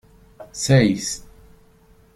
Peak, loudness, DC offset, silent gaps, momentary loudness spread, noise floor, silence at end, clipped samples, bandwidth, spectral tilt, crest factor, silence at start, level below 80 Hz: -2 dBFS; -19 LUFS; under 0.1%; none; 17 LU; -53 dBFS; 0.95 s; under 0.1%; 14.5 kHz; -5 dB/octave; 20 dB; 0.4 s; -50 dBFS